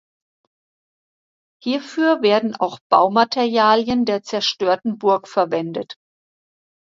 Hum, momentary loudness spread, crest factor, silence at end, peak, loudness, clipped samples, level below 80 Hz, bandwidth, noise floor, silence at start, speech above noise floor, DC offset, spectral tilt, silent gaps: none; 9 LU; 20 dB; 0.95 s; 0 dBFS; -18 LUFS; under 0.1%; -60 dBFS; 7.6 kHz; under -90 dBFS; 1.65 s; over 72 dB; under 0.1%; -4.5 dB/octave; 2.81-2.90 s